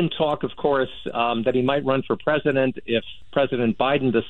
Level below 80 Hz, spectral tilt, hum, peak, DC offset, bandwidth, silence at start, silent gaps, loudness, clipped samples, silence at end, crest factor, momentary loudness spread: -52 dBFS; -8.5 dB/octave; none; -6 dBFS; 0.9%; 4.3 kHz; 0 s; none; -23 LUFS; under 0.1%; 0 s; 16 dB; 5 LU